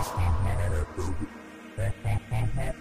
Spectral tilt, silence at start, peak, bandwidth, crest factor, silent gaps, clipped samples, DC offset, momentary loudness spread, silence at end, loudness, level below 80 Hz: -6.5 dB/octave; 0 s; -16 dBFS; 15.5 kHz; 12 dB; none; under 0.1%; 1%; 11 LU; 0 s; -31 LUFS; -34 dBFS